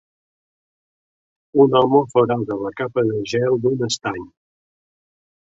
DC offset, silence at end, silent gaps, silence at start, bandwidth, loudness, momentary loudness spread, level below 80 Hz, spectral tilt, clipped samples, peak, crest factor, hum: under 0.1%; 1.25 s; none; 1.55 s; 8 kHz; -19 LUFS; 10 LU; -58 dBFS; -6 dB/octave; under 0.1%; -2 dBFS; 18 dB; none